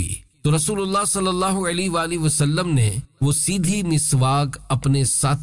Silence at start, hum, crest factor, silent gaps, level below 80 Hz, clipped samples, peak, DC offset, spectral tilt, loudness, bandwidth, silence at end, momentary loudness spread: 0 s; none; 10 dB; none; -44 dBFS; under 0.1%; -10 dBFS; 0.4%; -4.5 dB/octave; -20 LUFS; 11.5 kHz; 0 s; 5 LU